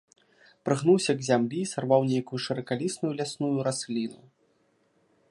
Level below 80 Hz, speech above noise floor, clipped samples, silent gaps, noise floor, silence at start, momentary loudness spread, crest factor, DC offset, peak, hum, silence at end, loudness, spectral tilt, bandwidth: -74 dBFS; 42 dB; under 0.1%; none; -68 dBFS; 0.65 s; 9 LU; 20 dB; under 0.1%; -8 dBFS; none; 1.15 s; -27 LUFS; -5.5 dB/octave; 11.5 kHz